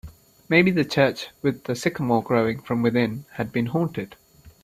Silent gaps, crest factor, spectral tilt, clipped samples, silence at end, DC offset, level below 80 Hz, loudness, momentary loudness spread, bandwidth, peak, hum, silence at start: none; 20 dB; -6.5 dB/octave; under 0.1%; 0.15 s; under 0.1%; -56 dBFS; -23 LUFS; 9 LU; 15 kHz; -4 dBFS; none; 0.05 s